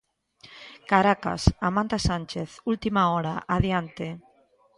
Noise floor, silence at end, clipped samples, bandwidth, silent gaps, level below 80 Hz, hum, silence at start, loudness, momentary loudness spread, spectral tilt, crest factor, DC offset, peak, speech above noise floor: -62 dBFS; 0.6 s; under 0.1%; 11.5 kHz; none; -40 dBFS; none; 0.5 s; -25 LUFS; 16 LU; -6 dB/octave; 24 dB; under 0.1%; -2 dBFS; 37 dB